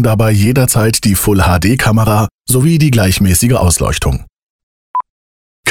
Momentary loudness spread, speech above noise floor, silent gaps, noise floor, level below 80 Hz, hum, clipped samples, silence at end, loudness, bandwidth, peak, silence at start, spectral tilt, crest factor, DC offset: 10 LU; over 80 dB; 2.34-2.39 s, 4.43-4.94 s, 5.10-5.63 s; under -90 dBFS; -26 dBFS; none; under 0.1%; 0 s; -11 LUFS; 18 kHz; 0 dBFS; 0 s; -5 dB/octave; 10 dB; 1%